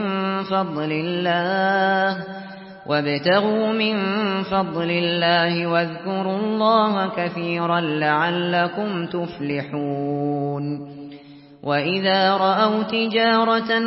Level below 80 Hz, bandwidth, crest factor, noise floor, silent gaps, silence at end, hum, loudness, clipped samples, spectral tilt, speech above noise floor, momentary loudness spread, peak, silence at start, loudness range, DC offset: -64 dBFS; 5.8 kHz; 16 dB; -43 dBFS; none; 0 s; none; -21 LUFS; under 0.1%; -10.5 dB/octave; 23 dB; 9 LU; -6 dBFS; 0 s; 4 LU; under 0.1%